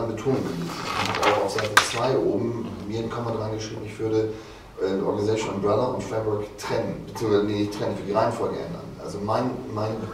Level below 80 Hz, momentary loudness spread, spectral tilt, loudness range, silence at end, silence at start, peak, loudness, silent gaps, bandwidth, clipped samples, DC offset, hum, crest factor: -52 dBFS; 10 LU; -5 dB/octave; 3 LU; 0 s; 0 s; -4 dBFS; -26 LUFS; none; 16 kHz; under 0.1%; under 0.1%; none; 22 dB